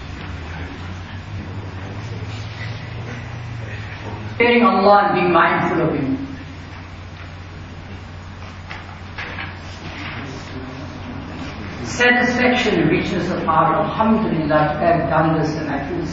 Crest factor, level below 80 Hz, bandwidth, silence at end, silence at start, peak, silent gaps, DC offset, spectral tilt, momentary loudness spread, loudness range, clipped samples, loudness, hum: 18 dB; -42 dBFS; 8 kHz; 0 s; 0 s; -2 dBFS; none; under 0.1%; -6 dB/octave; 20 LU; 14 LU; under 0.1%; -18 LUFS; none